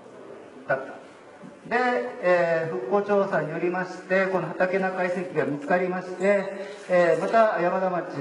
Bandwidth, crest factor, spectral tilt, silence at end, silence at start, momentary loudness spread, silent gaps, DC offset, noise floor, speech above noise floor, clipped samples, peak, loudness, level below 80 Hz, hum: 10.5 kHz; 18 dB; -6.5 dB/octave; 0 s; 0 s; 14 LU; none; under 0.1%; -45 dBFS; 21 dB; under 0.1%; -6 dBFS; -24 LUFS; -78 dBFS; none